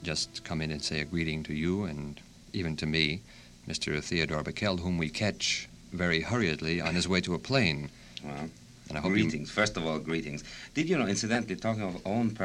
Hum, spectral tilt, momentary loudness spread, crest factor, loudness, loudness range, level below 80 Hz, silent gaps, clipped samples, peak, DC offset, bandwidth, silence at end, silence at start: none; -4.5 dB/octave; 12 LU; 20 dB; -31 LUFS; 3 LU; -52 dBFS; none; under 0.1%; -10 dBFS; under 0.1%; 12 kHz; 0 s; 0 s